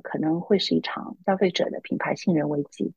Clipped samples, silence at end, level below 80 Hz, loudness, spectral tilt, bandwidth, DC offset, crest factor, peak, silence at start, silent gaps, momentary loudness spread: under 0.1%; 0.05 s; -68 dBFS; -25 LUFS; -6 dB/octave; 8.8 kHz; under 0.1%; 16 dB; -8 dBFS; 0.05 s; none; 6 LU